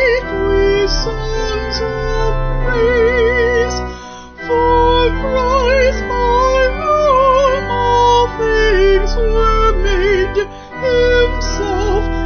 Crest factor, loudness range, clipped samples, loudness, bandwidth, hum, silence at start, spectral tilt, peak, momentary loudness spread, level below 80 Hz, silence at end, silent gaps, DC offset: 12 dB; 3 LU; under 0.1%; -14 LUFS; 6.6 kHz; none; 0 s; -5 dB/octave; 0 dBFS; 8 LU; -20 dBFS; 0 s; none; under 0.1%